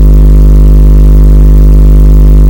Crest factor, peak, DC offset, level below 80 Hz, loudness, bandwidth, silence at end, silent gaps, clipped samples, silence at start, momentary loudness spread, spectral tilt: 0 dB; 0 dBFS; 4%; -2 dBFS; -5 LUFS; 16.5 kHz; 0 s; none; 60%; 0 s; 0 LU; -9.5 dB/octave